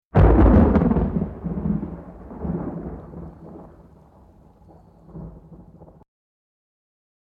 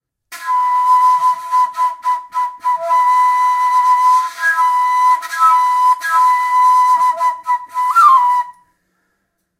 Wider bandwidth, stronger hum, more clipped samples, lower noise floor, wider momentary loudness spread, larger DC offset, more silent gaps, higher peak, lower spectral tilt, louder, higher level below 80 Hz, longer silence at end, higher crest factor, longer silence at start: second, 3.8 kHz vs 16 kHz; neither; neither; second, -51 dBFS vs -68 dBFS; first, 26 LU vs 8 LU; neither; neither; about the same, -2 dBFS vs 0 dBFS; first, -11.5 dB/octave vs 1.5 dB/octave; second, -20 LUFS vs -13 LUFS; first, -28 dBFS vs -74 dBFS; first, 1.8 s vs 1.1 s; first, 20 dB vs 14 dB; second, 0.15 s vs 0.3 s